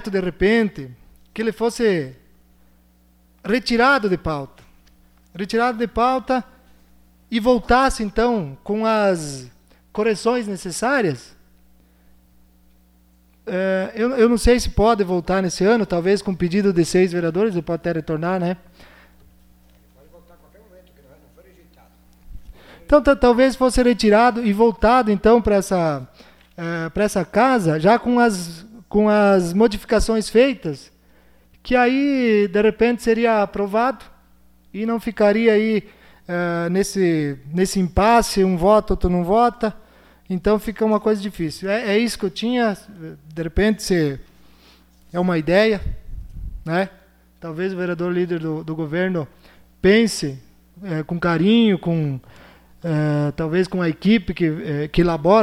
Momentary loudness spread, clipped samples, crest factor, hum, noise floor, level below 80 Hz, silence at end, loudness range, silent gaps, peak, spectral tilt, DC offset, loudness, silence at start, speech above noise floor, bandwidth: 13 LU; under 0.1%; 16 dB; none; -55 dBFS; -38 dBFS; 0 s; 7 LU; none; -4 dBFS; -6 dB/octave; under 0.1%; -19 LUFS; 0 s; 37 dB; 15 kHz